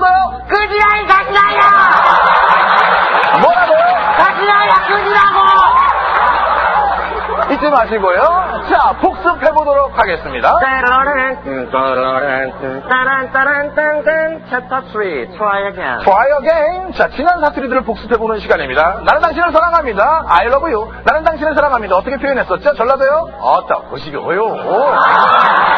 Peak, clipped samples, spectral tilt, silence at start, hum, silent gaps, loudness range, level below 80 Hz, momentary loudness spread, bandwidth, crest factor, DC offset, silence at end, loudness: 0 dBFS; 0.1%; -5.5 dB/octave; 0 s; none; none; 5 LU; -36 dBFS; 9 LU; 6.6 kHz; 12 dB; under 0.1%; 0 s; -12 LUFS